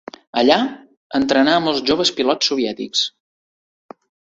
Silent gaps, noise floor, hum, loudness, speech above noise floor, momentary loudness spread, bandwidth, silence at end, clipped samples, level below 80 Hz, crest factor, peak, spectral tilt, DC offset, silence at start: 0.97-1.10 s; under -90 dBFS; none; -18 LUFS; over 73 dB; 9 LU; 8 kHz; 1.2 s; under 0.1%; -56 dBFS; 18 dB; 0 dBFS; -3 dB/octave; under 0.1%; 0.35 s